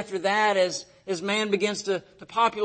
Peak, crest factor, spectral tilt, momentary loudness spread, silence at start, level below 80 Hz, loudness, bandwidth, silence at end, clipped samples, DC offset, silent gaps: -8 dBFS; 16 dB; -3 dB/octave; 10 LU; 0 s; -70 dBFS; -26 LUFS; 8.8 kHz; 0 s; under 0.1%; under 0.1%; none